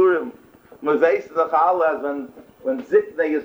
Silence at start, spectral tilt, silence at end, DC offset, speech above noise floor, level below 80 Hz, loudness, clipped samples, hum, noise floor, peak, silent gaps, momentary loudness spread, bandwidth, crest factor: 0 s; -6.5 dB/octave; 0 s; under 0.1%; 28 dB; -68 dBFS; -20 LUFS; under 0.1%; none; -47 dBFS; -4 dBFS; none; 13 LU; over 20 kHz; 16 dB